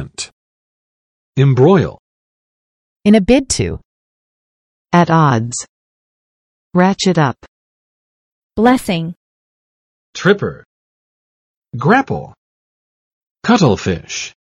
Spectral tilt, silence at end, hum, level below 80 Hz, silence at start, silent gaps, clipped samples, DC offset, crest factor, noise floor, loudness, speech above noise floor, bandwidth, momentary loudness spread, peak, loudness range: -5.5 dB/octave; 0.2 s; none; -42 dBFS; 0 s; 0.33-1.33 s, 1.99-3.00 s, 3.85-4.85 s, 5.69-6.71 s, 7.48-8.50 s, 9.16-10.13 s, 10.65-11.62 s, 12.38-13.35 s; under 0.1%; under 0.1%; 16 dB; under -90 dBFS; -14 LUFS; over 77 dB; 12.5 kHz; 16 LU; 0 dBFS; 4 LU